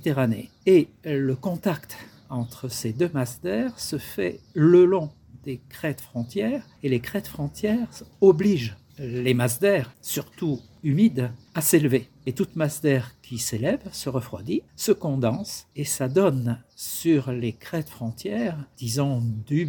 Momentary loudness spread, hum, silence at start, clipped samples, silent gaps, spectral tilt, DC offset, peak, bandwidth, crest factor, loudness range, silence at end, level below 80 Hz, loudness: 13 LU; none; 0 s; under 0.1%; none; -6 dB/octave; under 0.1%; -4 dBFS; 18 kHz; 20 dB; 4 LU; 0 s; -58 dBFS; -25 LUFS